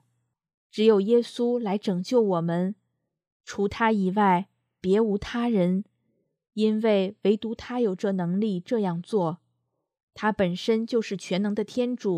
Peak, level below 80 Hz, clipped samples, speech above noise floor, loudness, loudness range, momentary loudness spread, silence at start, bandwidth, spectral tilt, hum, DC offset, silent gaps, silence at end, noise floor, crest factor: -8 dBFS; -60 dBFS; under 0.1%; 53 dB; -25 LUFS; 3 LU; 9 LU; 0.75 s; 10.5 kHz; -7 dB/octave; none; under 0.1%; 3.27-3.40 s, 10.03-10.08 s; 0 s; -77 dBFS; 18 dB